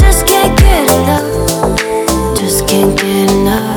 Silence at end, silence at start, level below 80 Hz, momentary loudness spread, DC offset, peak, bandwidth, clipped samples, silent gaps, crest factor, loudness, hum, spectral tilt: 0 s; 0 s; -16 dBFS; 5 LU; under 0.1%; 0 dBFS; over 20 kHz; under 0.1%; none; 10 dB; -10 LUFS; none; -4.5 dB/octave